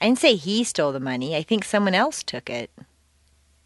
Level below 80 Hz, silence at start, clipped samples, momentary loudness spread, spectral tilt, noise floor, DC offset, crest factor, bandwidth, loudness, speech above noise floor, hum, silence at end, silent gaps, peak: -62 dBFS; 0 s; under 0.1%; 13 LU; -4 dB/octave; -61 dBFS; under 0.1%; 20 dB; 11.5 kHz; -23 LUFS; 39 dB; none; 1 s; none; -4 dBFS